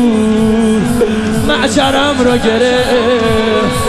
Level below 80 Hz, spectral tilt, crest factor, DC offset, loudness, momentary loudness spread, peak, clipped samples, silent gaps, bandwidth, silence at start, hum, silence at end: -30 dBFS; -5 dB/octave; 10 dB; under 0.1%; -11 LUFS; 2 LU; 0 dBFS; under 0.1%; none; 14 kHz; 0 s; none; 0 s